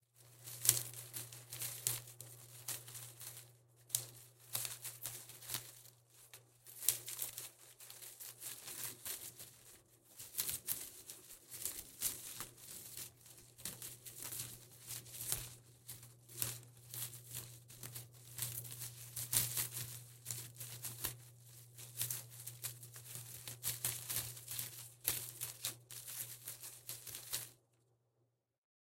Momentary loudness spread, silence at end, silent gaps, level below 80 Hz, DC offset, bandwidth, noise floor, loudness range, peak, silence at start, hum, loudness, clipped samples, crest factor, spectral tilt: 16 LU; 1.45 s; none; -74 dBFS; under 0.1%; 17 kHz; -82 dBFS; 5 LU; -6 dBFS; 0.15 s; none; -43 LUFS; under 0.1%; 42 dB; -1 dB/octave